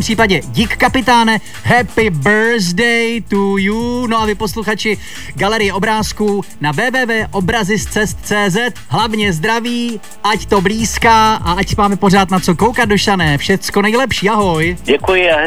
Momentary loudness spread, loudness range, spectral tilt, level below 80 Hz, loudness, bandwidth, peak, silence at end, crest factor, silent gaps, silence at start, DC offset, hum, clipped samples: 6 LU; 4 LU; -4.5 dB/octave; -32 dBFS; -13 LUFS; 19.5 kHz; 0 dBFS; 0 s; 14 dB; none; 0 s; 3%; none; under 0.1%